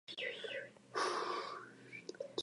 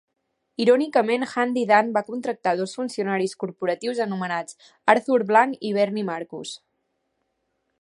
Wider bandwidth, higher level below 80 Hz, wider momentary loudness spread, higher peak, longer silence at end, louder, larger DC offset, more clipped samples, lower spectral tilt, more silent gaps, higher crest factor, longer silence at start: about the same, 11.5 kHz vs 11.5 kHz; second, under -90 dBFS vs -76 dBFS; about the same, 13 LU vs 12 LU; second, -24 dBFS vs -2 dBFS; second, 0 s vs 1.25 s; second, -43 LUFS vs -23 LUFS; neither; neither; second, -2 dB/octave vs -5 dB/octave; neither; about the same, 20 dB vs 22 dB; second, 0.1 s vs 0.6 s